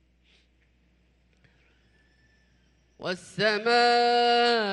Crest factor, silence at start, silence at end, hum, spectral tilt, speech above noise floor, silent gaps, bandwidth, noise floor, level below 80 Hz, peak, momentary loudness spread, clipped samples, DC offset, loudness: 16 dB; 3 s; 0 s; none; -3.5 dB/octave; 42 dB; none; 11.5 kHz; -65 dBFS; -68 dBFS; -12 dBFS; 14 LU; under 0.1%; under 0.1%; -23 LUFS